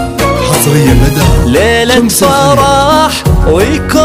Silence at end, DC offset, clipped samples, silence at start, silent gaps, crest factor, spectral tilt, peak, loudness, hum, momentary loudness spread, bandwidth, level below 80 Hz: 0 s; under 0.1%; 1%; 0 s; none; 8 dB; -5 dB/octave; 0 dBFS; -8 LUFS; none; 3 LU; 16.5 kHz; -16 dBFS